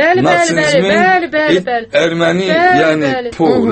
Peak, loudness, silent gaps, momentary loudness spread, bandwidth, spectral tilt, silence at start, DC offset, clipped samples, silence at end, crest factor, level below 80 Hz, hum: 0 dBFS; -11 LUFS; none; 5 LU; 8.8 kHz; -4.5 dB/octave; 0 s; under 0.1%; under 0.1%; 0 s; 12 dB; -48 dBFS; none